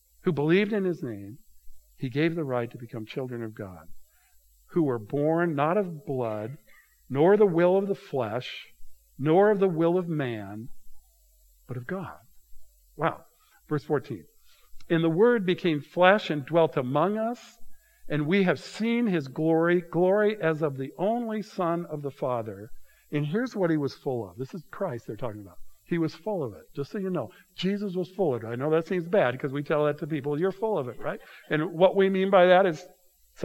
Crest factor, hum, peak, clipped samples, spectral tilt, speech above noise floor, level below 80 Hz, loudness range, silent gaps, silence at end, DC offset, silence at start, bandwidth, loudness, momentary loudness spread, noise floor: 24 dB; none; -2 dBFS; under 0.1%; -7.5 dB/octave; 34 dB; -60 dBFS; 9 LU; none; 0 s; under 0.1%; 0.25 s; 16.5 kHz; -27 LUFS; 16 LU; -61 dBFS